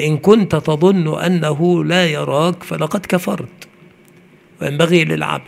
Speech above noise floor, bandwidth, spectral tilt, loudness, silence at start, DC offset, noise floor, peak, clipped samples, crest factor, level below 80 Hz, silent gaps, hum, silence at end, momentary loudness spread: 32 dB; 16 kHz; -6 dB/octave; -15 LUFS; 0 s; under 0.1%; -47 dBFS; 0 dBFS; under 0.1%; 16 dB; -54 dBFS; none; none; 0.05 s; 11 LU